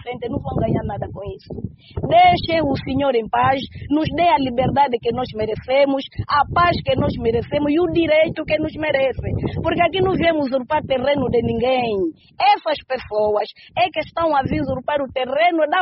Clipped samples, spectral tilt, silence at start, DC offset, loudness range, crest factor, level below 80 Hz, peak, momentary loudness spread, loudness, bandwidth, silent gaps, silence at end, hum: under 0.1%; -4 dB/octave; 0 s; under 0.1%; 2 LU; 16 dB; -40 dBFS; -4 dBFS; 8 LU; -19 LUFS; 5.8 kHz; none; 0 s; none